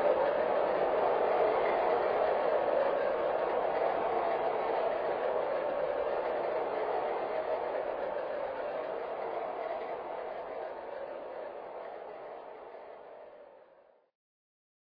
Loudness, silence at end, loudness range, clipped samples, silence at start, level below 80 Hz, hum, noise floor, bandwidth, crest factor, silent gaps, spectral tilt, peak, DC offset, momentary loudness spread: -32 LUFS; 1.35 s; 15 LU; under 0.1%; 0 s; -68 dBFS; none; -63 dBFS; 5.2 kHz; 18 dB; none; -2.5 dB/octave; -16 dBFS; under 0.1%; 15 LU